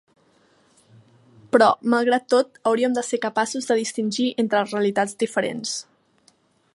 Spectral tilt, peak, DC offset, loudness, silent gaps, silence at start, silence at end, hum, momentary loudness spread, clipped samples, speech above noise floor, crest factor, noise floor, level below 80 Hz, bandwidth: -3.5 dB/octave; -2 dBFS; under 0.1%; -22 LUFS; none; 1.55 s; 0.95 s; none; 8 LU; under 0.1%; 40 dB; 22 dB; -61 dBFS; -74 dBFS; 11.5 kHz